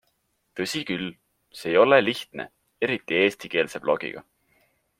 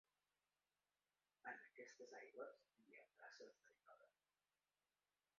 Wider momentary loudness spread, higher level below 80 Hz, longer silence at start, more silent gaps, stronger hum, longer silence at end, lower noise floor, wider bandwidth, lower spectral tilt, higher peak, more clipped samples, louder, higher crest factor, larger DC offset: first, 19 LU vs 11 LU; first, -66 dBFS vs under -90 dBFS; second, 0.55 s vs 1.45 s; neither; second, none vs 50 Hz at -105 dBFS; second, 0.8 s vs 1.3 s; second, -72 dBFS vs under -90 dBFS; first, 16 kHz vs 7 kHz; first, -4.5 dB/octave vs -0.5 dB/octave; first, -2 dBFS vs -42 dBFS; neither; first, -24 LUFS vs -61 LUFS; about the same, 24 dB vs 24 dB; neither